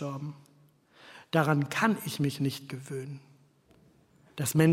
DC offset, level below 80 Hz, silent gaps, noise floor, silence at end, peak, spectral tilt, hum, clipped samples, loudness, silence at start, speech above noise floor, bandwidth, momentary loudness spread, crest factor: under 0.1%; -70 dBFS; none; -62 dBFS; 0 s; -10 dBFS; -5.5 dB/octave; none; under 0.1%; -30 LUFS; 0 s; 34 dB; 16.5 kHz; 21 LU; 22 dB